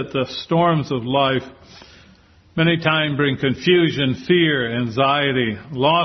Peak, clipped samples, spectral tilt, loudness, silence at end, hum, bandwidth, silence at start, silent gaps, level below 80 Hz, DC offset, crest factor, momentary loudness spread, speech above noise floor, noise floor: -2 dBFS; under 0.1%; -7 dB/octave; -18 LUFS; 0 s; none; 6.4 kHz; 0 s; none; -54 dBFS; under 0.1%; 18 dB; 6 LU; 32 dB; -51 dBFS